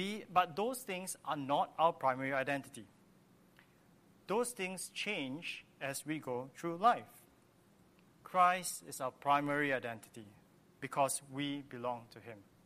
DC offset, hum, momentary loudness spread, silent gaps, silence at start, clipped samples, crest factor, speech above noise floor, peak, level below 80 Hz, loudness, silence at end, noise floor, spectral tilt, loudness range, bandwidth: under 0.1%; none; 14 LU; none; 0 s; under 0.1%; 24 dB; 30 dB; -14 dBFS; -80 dBFS; -36 LUFS; 0.25 s; -67 dBFS; -3.5 dB/octave; 5 LU; 15 kHz